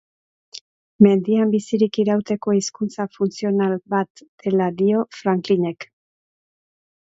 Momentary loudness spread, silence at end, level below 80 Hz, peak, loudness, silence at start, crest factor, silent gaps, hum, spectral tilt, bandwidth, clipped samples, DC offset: 18 LU; 1.3 s; -64 dBFS; 0 dBFS; -20 LUFS; 0.55 s; 20 dB; 0.61-0.99 s, 4.10-4.15 s, 4.28-4.38 s; none; -6.5 dB/octave; 8 kHz; under 0.1%; under 0.1%